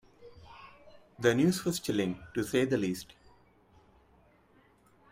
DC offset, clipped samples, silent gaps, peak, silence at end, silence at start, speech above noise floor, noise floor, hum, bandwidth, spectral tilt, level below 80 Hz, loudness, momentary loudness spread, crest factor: under 0.1%; under 0.1%; none; -12 dBFS; 2.05 s; 0.2 s; 34 dB; -64 dBFS; none; 16 kHz; -5.5 dB/octave; -64 dBFS; -30 LUFS; 25 LU; 22 dB